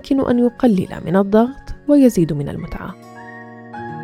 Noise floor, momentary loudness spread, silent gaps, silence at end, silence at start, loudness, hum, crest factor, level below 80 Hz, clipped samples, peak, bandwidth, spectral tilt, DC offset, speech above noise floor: -36 dBFS; 22 LU; none; 0 s; 0.05 s; -16 LUFS; none; 16 dB; -40 dBFS; under 0.1%; 0 dBFS; 15 kHz; -7.5 dB/octave; under 0.1%; 20 dB